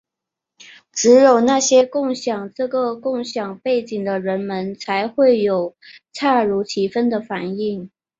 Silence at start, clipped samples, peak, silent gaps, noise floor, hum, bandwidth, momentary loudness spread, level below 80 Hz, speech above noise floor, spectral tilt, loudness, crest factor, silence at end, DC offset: 0.7 s; under 0.1%; -2 dBFS; none; -84 dBFS; none; 7.8 kHz; 12 LU; -64 dBFS; 66 dB; -4 dB/octave; -18 LUFS; 16 dB; 0.35 s; under 0.1%